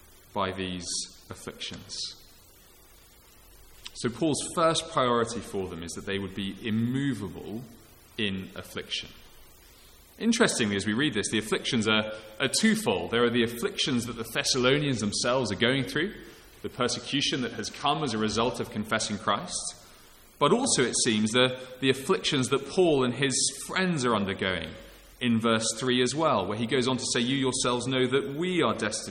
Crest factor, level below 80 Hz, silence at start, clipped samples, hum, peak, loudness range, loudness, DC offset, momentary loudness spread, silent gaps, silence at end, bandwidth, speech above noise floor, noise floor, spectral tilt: 20 dB; -56 dBFS; 0.35 s; under 0.1%; none; -8 dBFS; 8 LU; -27 LUFS; under 0.1%; 13 LU; none; 0 s; 17 kHz; 27 dB; -55 dBFS; -3.5 dB/octave